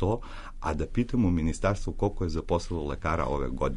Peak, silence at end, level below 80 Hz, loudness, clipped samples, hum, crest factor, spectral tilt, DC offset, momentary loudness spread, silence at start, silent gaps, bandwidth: -14 dBFS; 0 s; -36 dBFS; -30 LUFS; under 0.1%; none; 14 dB; -7 dB/octave; under 0.1%; 7 LU; 0 s; none; 10.5 kHz